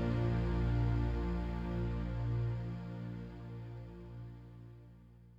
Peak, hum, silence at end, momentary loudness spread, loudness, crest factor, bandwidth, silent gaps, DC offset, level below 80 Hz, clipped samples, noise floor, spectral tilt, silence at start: -24 dBFS; 60 Hz at -65 dBFS; 0 s; 19 LU; -38 LUFS; 14 dB; 5.4 kHz; none; under 0.1%; -42 dBFS; under 0.1%; -58 dBFS; -9 dB/octave; 0 s